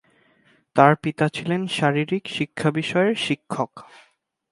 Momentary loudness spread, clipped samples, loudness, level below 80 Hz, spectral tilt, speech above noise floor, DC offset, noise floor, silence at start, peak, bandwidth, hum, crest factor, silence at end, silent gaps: 10 LU; under 0.1%; -22 LUFS; -64 dBFS; -6 dB/octave; 39 dB; under 0.1%; -60 dBFS; 0.75 s; 0 dBFS; 11.5 kHz; none; 22 dB; 0.7 s; none